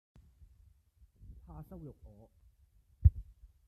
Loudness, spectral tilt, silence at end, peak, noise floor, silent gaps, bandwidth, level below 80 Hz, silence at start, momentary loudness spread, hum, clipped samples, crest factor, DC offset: -32 LUFS; -11.5 dB/octave; 0.45 s; -10 dBFS; -67 dBFS; none; 1.4 kHz; -40 dBFS; 1.6 s; 28 LU; none; under 0.1%; 26 dB; under 0.1%